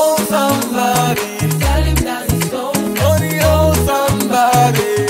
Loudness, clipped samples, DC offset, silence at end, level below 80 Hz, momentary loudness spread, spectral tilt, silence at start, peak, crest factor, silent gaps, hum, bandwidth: -14 LUFS; under 0.1%; under 0.1%; 0 s; -24 dBFS; 6 LU; -5 dB/octave; 0 s; -2 dBFS; 12 dB; none; none; 16.5 kHz